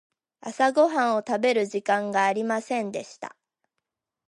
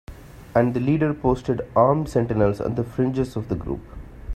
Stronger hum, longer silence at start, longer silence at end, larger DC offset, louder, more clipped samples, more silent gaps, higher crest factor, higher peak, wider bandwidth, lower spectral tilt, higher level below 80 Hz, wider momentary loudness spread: neither; first, 0.45 s vs 0.1 s; first, 1 s vs 0 s; neither; about the same, -24 LUFS vs -22 LUFS; neither; neither; about the same, 18 dB vs 20 dB; second, -8 dBFS vs -4 dBFS; second, 11.5 kHz vs 13.5 kHz; second, -4.5 dB/octave vs -9 dB/octave; second, -80 dBFS vs -40 dBFS; first, 18 LU vs 11 LU